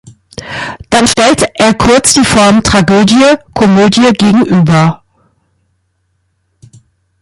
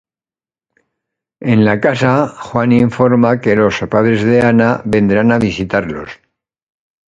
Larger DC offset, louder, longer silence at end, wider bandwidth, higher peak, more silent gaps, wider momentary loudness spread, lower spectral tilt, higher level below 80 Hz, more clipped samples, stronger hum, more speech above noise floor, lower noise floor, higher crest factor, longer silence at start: neither; first, -7 LUFS vs -12 LUFS; first, 2.25 s vs 1.05 s; first, 14.5 kHz vs 7.8 kHz; about the same, 0 dBFS vs 0 dBFS; neither; first, 14 LU vs 7 LU; second, -4.5 dB/octave vs -7.5 dB/octave; first, -34 dBFS vs -44 dBFS; neither; neither; second, 53 dB vs over 78 dB; second, -60 dBFS vs under -90 dBFS; about the same, 10 dB vs 14 dB; second, 0.4 s vs 1.4 s